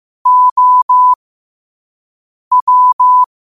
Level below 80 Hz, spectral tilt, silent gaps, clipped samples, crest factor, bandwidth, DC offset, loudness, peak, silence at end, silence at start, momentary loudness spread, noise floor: -66 dBFS; -1 dB/octave; 0.51-0.56 s, 0.82-0.89 s, 1.16-2.51 s, 2.62-2.67 s, 2.93-2.99 s; under 0.1%; 8 dB; 1.3 kHz; 0.4%; -9 LUFS; -4 dBFS; 0.2 s; 0.25 s; 5 LU; under -90 dBFS